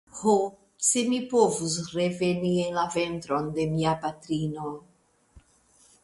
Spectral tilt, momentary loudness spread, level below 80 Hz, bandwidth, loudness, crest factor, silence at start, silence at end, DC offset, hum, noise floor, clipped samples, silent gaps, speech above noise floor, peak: -4.5 dB/octave; 8 LU; -60 dBFS; 11.5 kHz; -26 LUFS; 20 dB; 0.15 s; 0.65 s; under 0.1%; none; -61 dBFS; under 0.1%; none; 35 dB; -8 dBFS